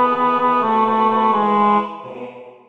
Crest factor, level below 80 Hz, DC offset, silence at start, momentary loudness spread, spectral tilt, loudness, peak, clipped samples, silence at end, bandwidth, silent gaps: 14 dB; -68 dBFS; 0.4%; 0 s; 17 LU; -7.5 dB/octave; -16 LUFS; -4 dBFS; under 0.1%; 0.2 s; 7.2 kHz; none